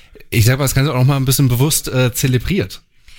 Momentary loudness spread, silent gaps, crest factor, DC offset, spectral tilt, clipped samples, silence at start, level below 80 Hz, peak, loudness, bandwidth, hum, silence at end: 7 LU; none; 14 dB; under 0.1%; -5 dB/octave; under 0.1%; 0.15 s; -34 dBFS; -2 dBFS; -15 LUFS; 17 kHz; none; 0.4 s